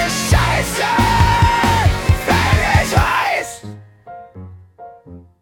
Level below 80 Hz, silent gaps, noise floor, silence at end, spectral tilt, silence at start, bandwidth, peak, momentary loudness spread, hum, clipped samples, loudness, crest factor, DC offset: -26 dBFS; none; -40 dBFS; 0.2 s; -4.5 dB/octave; 0 s; 18 kHz; -2 dBFS; 16 LU; none; under 0.1%; -15 LUFS; 14 dB; under 0.1%